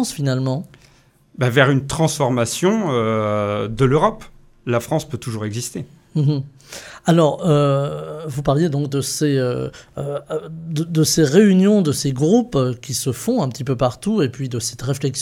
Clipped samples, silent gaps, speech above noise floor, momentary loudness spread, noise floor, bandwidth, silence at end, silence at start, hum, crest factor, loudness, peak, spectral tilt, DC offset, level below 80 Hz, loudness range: under 0.1%; none; 35 dB; 12 LU; -53 dBFS; 16.5 kHz; 0 s; 0 s; none; 18 dB; -19 LUFS; 0 dBFS; -5.5 dB/octave; under 0.1%; -48 dBFS; 5 LU